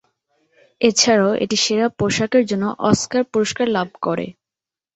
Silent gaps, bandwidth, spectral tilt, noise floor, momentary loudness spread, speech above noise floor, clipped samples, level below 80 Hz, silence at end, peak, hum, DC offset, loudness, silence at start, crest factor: none; 8.2 kHz; -3.5 dB/octave; -89 dBFS; 9 LU; 71 dB; under 0.1%; -54 dBFS; 0.65 s; -2 dBFS; none; under 0.1%; -18 LUFS; 0.8 s; 18 dB